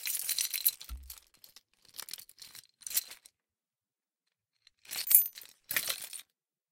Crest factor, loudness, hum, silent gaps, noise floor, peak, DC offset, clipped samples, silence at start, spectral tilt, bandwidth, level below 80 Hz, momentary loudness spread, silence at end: 34 dB; -29 LUFS; none; none; under -90 dBFS; -4 dBFS; under 0.1%; under 0.1%; 0 s; 2 dB/octave; 17 kHz; -60 dBFS; 26 LU; 0.5 s